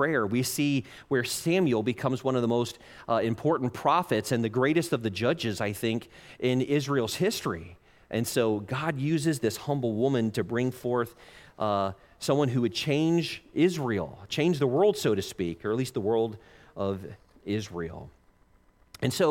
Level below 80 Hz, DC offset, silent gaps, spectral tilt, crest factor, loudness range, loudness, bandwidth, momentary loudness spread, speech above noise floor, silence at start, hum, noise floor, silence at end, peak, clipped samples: -60 dBFS; under 0.1%; none; -5.5 dB/octave; 18 dB; 3 LU; -28 LUFS; 17 kHz; 9 LU; 34 dB; 0 s; none; -62 dBFS; 0 s; -10 dBFS; under 0.1%